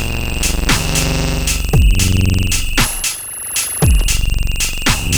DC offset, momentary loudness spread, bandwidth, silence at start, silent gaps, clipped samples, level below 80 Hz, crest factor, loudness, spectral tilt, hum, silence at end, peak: under 0.1%; 5 LU; over 20 kHz; 0 s; none; under 0.1%; -18 dBFS; 14 dB; -16 LUFS; -3.5 dB/octave; none; 0 s; 0 dBFS